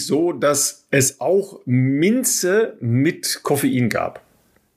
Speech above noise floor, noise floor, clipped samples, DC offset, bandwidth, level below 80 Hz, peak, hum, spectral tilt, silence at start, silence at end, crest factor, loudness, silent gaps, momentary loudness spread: 40 dB; -59 dBFS; under 0.1%; under 0.1%; 15.5 kHz; -62 dBFS; -4 dBFS; none; -4.5 dB/octave; 0 s; 0.6 s; 16 dB; -19 LUFS; none; 5 LU